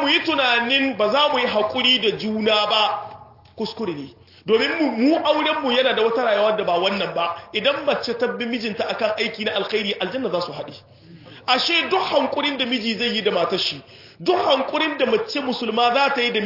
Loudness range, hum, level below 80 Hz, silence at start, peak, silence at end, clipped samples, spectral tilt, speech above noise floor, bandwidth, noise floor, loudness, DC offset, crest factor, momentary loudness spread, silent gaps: 3 LU; none; -64 dBFS; 0 s; -4 dBFS; 0 s; under 0.1%; -4 dB/octave; 22 dB; 5.8 kHz; -43 dBFS; -20 LUFS; under 0.1%; 18 dB; 10 LU; none